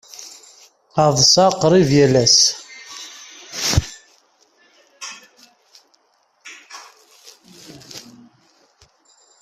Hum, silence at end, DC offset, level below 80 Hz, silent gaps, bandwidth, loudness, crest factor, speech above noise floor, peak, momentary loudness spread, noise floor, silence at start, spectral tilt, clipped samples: none; 1.4 s; under 0.1%; -44 dBFS; none; 15.5 kHz; -14 LUFS; 20 dB; 49 dB; 0 dBFS; 26 LU; -62 dBFS; 0.2 s; -3.5 dB/octave; under 0.1%